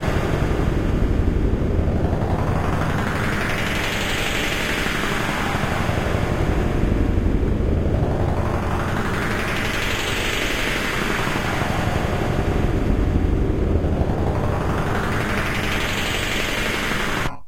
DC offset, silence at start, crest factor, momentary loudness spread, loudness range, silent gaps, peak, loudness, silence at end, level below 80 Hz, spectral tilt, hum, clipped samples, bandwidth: under 0.1%; 0 s; 16 dB; 1 LU; 0 LU; none; -4 dBFS; -22 LUFS; 0 s; -26 dBFS; -5.5 dB/octave; none; under 0.1%; 16 kHz